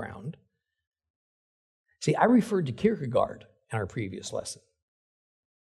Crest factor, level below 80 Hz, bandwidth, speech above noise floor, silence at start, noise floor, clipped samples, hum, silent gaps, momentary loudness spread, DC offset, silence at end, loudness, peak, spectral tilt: 24 dB; -64 dBFS; 12.5 kHz; over 63 dB; 0 s; under -90 dBFS; under 0.1%; none; 0.87-0.92 s, 1.10-1.84 s; 19 LU; under 0.1%; 1.2 s; -28 LUFS; -6 dBFS; -6 dB/octave